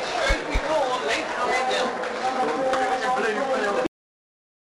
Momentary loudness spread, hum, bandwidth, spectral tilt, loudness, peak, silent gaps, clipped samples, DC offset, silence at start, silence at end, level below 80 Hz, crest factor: 3 LU; none; 13 kHz; -3.5 dB/octave; -24 LUFS; -10 dBFS; none; under 0.1%; under 0.1%; 0 s; 0.8 s; -38 dBFS; 16 dB